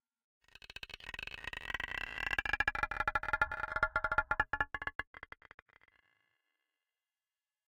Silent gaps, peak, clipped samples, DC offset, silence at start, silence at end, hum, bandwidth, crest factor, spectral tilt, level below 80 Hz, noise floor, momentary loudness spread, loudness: 4.95-4.99 s, 5.07-5.14 s; -16 dBFS; under 0.1%; under 0.1%; 0.85 s; 2.5 s; none; 17 kHz; 24 dB; -3.5 dB/octave; -54 dBFS; under -90 dBFS; 17 LU; -36 LUFS